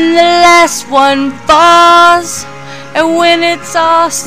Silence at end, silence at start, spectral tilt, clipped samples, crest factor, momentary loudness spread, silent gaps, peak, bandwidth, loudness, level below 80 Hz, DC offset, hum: 0 s; 0 s; -2 dB/octave; 3%; 8 dB; 14 LU; none; 0 dBFS; 16 kHz; -7 LUFS; -44 dBFS; under 0.1%; none